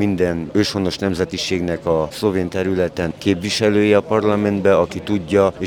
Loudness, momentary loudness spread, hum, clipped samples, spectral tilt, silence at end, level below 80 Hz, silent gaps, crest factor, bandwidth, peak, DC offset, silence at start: -18 LUFS; 5 LU; none; under 0.1%; -5.5 dB/octave; 0 s; -48 dBFS; none; 16 dB; 17 kHz; -2 dBFS; under 0.1%; 0 s